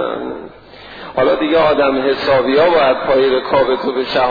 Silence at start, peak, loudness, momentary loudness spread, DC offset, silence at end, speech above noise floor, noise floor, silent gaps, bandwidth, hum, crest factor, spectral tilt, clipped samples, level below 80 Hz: 0 s; -2 dBFS; -14 LUFS; 13 LU; 0.2%; 0 s; 23 dB; -37 dBFS; none; 5 kHz; none; 12 dB; -7 dB/octave; under 0.1%; -44 dBFS